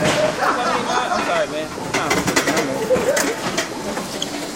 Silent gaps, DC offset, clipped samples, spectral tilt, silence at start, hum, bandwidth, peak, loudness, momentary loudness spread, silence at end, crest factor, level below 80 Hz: none; under 0.1%; under 0.1%; -3 dB/octave; 0 s; none; 16.5 kHz; -2 dBFS; -20 LUFS; 7 LU; 0 s; 18 dB; -48 dBFS